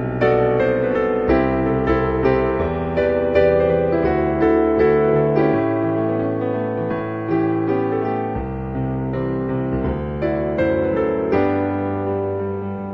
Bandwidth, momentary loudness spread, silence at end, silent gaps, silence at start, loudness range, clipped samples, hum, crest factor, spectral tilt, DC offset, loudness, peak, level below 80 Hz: 5.8 kHz; 8 LU; 0 s; none; 0 s; 5 LU; under 0.1%; none; 16 dB; -10 dB/octave; under 0.1%; -19 LUFS; -2 dBFS; -36 dBFS